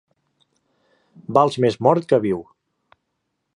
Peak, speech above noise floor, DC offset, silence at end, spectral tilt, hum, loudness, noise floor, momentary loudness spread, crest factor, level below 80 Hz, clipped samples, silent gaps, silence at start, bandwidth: -2 dBFS; 58 dB; under 0.1%; 1.15 s; -7 dB/octave; none; -19 LUFS; -76 dBFS; 10 LU; 20 dB; -60 dBFS; under 0.1%; none; 1.3 s; 11 kHz